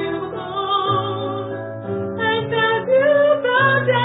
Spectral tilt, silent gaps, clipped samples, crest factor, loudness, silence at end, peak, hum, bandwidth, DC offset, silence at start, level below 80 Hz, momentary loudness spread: -10.5 dB/octave; none; under 0.1%; 14 dB; -19 LUFS; 0 s; -4 dBFS; none; 4 kHz; under 0.1%; 0 s; -54 dBFS; 11 LU